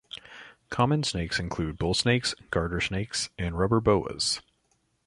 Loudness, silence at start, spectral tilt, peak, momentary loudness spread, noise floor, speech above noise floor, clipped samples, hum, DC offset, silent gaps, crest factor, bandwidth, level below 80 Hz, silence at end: -27 LUFS; 0.15 s; -4.5 dB/octave; -8 dBFS; 11 LU; -71 dBFS; 44 dB; under 0.1%; none; under 0.1%; none; 20 dB; 11.5 kHz; -44 dBFS; 0.65 s